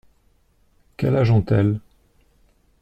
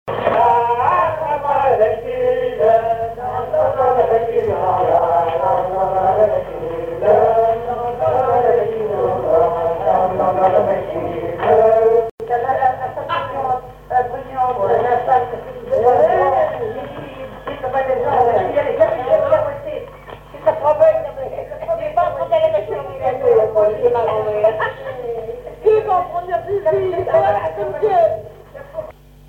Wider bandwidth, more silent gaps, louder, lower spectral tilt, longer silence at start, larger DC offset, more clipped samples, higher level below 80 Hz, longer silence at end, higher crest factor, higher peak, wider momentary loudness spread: second, 6 kHz vs 7 kHz; second, none vs 12.11-12.18 s; second, -20 LUFS vs -17 LUFS; first, -9.5 dB/octave vs -7.5 dB/octave; first, 1 s vs 0.05 s; neither; neither; about the same, -48 dBFS vs -44 dBFS; first, 1.05 s vs 0.35 s; about the same, 16 dB vs 16 dB; second, -8 dBFS vs -2 dBFS; second, 8 LU vs 12 LU